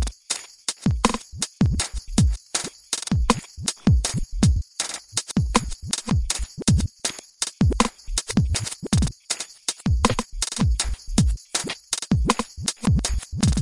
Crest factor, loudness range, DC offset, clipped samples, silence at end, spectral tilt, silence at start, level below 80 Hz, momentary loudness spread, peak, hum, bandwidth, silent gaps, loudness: 22 dB; 1 LU; under 0.1%; under 0.1%; 0 s; -4 dB/octave; 0 s; -30 dBFS; 7 LU; 0 dBFS; none; 11.5 kHz; none; -24 LUFS